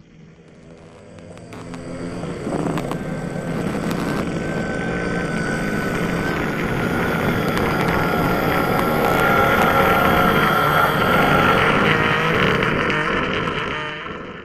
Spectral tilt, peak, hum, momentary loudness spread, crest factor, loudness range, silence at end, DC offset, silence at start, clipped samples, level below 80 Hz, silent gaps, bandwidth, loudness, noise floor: -5.5 dB/octave; -2 dBFS; none; 12 LU; 18 dB; 10 LU; 0 s; under 0.1%; 0.2 s; under 0.1%; -38 dBFS; none; 15 kHz; -19 LUFS; -45 dBFS